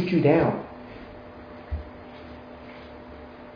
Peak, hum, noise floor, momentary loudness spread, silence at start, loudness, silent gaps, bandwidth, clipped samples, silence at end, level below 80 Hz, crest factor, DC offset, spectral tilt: -6 dBFS; none; -43 dBFS; 23 LU; 0 s; -24 LUFS; none; 5.2 kHz; under 0.1%; 0 s; -46 dBFS; 22 dB; under 0.1%; -9.5 dB/octave